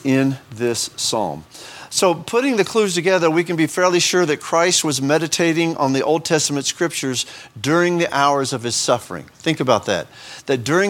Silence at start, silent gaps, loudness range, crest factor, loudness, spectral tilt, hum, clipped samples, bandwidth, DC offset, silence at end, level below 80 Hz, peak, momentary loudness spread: 0 s; none; 3 LU; 18 dB; -18 LUFS; -3.5 dB/octave; none; under 0.1%; 17.5 kHz; under 0.1%; 0 s; -60 dBFS; 0 dBFS; 8 LU